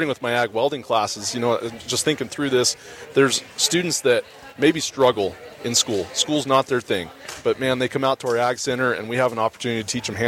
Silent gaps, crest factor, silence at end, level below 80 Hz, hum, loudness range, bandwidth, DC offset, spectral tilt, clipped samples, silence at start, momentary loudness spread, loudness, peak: none; 18 dB; 0 s; -58 dBFS; none; 2 LU; 16.5 kHz; under 0.1%; -3 dB/octave; under 0.1%; 0 s; 7 LU; -21 LUFS; -4 dBFS